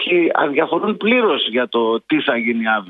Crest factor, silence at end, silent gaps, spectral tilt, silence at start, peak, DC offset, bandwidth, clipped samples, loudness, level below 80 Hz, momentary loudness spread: 16 dB; 0 s; none; -7.5 dB/octave; 0 s; -2 dBFS; under 0.1%; 4.6 kHz; under 0.1%; -17 LUFS; -66 dBFS; 3 LU